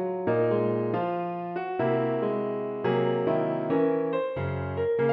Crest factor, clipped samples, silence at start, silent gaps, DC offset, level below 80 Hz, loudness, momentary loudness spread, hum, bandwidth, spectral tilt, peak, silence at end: 14 dB; under 0.1%; 0 s; none; under 0.1%; -62 dBFS; -27 LUFS; 6 LU; none; 5 kHz; -10.5 dB/octave; -14 dBFS; 0 s